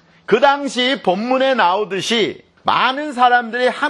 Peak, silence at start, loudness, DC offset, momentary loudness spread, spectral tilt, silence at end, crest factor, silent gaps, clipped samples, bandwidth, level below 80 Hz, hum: 0 dBFS; 0.3 s; -16 LUFS; under 0.1%; 5 LU; -3.5 dB/octave; 0 s; 16 dB; none; under 0.1%; 12 kHz; -66 dBFS; none